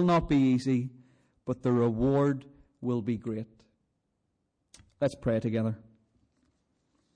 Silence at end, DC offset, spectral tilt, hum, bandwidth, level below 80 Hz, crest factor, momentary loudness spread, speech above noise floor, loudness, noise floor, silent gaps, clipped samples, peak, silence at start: 1.4 s; under 0.1%; -8 dB/octave; none; 10 kHz; -52 dBFS; 12 dB; 14 LU; 51 dB; -29 LUFS; -78 dBFS; none; under 0.1%; -18 dBFS; 0 s